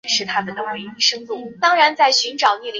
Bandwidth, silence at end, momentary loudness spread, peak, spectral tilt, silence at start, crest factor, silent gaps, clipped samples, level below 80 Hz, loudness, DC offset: 7.6 kHz; 0 s; 13 LU; -2 dBFS; -1 dB/octave; 0.05 s; 16 dB; none; under 0.1%; -68 dBFS; -17 LUFS; under 0.1%